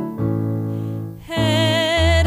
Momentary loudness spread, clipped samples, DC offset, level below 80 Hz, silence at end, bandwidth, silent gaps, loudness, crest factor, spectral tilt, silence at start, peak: 10 LU; under 0.1%; under 0.1%; -30 dBFS; 0 s; 16 kHz; none; -20 LUFS; 14 dB; -5.5 dB/octave; 0 s; -6 dBFS